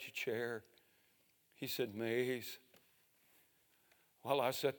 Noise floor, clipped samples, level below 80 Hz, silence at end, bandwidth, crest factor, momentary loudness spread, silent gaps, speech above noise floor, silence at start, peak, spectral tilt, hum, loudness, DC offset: -75 dBFS; under 0.1%; under -90 dBFS; 0 s; 19.5 kHz; 22 dB; 13 LU; none; 35 dB; 0 s; -20 dBFS; -4 dB/octave; none; -40 LUFS; under 0.1%